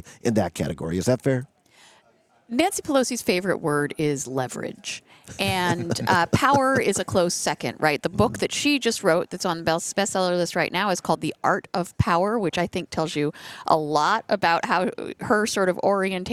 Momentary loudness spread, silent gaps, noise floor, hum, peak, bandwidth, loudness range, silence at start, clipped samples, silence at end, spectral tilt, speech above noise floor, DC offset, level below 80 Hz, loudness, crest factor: 7 LU; none; -61 dBFS; none; -2 dBFS; 16.5 kHz; 3 LU; 0.05 s; under 0.1%; 0 s; -4.5 dB/octave; 38 dB; under 0.1%; -54 dBFS; -23 LUFS; 20 dB